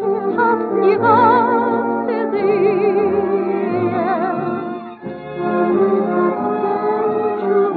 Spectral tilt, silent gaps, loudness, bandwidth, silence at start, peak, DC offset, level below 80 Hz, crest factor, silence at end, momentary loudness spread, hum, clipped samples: -10.5 dB/octave; none; -17 LUFS; 4.7 kHz; 0 s; -2 dBFS; under 0.1%; -60 dBFS; 16 dB; 0 s; 10 LU; none; under 0.1%